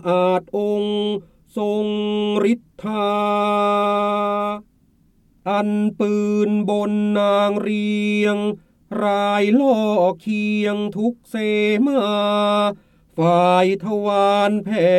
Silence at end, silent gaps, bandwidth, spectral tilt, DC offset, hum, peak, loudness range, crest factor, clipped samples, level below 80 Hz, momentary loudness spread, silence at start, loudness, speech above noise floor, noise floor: 0 s; none; 12 kHz; -6.5 dB/octave; under 0.1%; none; -4 dBFS; 3 LU; 14 dB; under 0.1%; -60 dBFS; 8 LU; 0.05 s; -19 LUFS; 39 dB; -57 dBFS